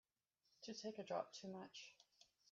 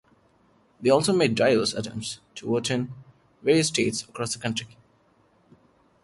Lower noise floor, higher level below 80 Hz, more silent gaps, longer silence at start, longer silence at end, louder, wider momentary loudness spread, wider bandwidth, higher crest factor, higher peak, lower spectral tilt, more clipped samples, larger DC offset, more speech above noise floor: first, -87 dBFS vs -62 dBFS; second, under -90 dBFS vs -62 dBFS; neither; second, 0.6 s vs 0.8 s; second, 0 s vs 1.4 s; second, -52 LUFS vs -25 LUFS; about the same, 13 LU vs 13 LU; second, 7.4 kHz vs 11.5 kHz; about the same, 22 dB vs 20 dB; second, -32 dBFS vs -8 dBFS; about the same, -3.5 dB/octave vs -4 dB/octave; neither; neither; about the same, 36 dB vs 38 dB